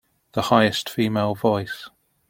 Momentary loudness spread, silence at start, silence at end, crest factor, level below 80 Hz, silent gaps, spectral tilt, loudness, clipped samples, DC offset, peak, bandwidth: 13 LU; 0.35 s; 0.4 s; 20 dB; -58 dBFS; none; -5.5 dB/octave; -22 LUFS; under 0.1%; under 0.1%; -2 dBFS; 16.5 kHz